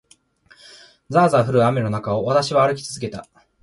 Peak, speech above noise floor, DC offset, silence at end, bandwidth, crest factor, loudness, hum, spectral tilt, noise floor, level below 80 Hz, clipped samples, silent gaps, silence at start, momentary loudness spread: -4 dBFS; 36 dB; under 0.1%; 0.4 s; 11.5 kHz; 16 dB; -19 LUFS; none; -6 dB/octave; -54 dBFS; -54 dBFS; under 0.1%; none; 1.1 s; 13 LU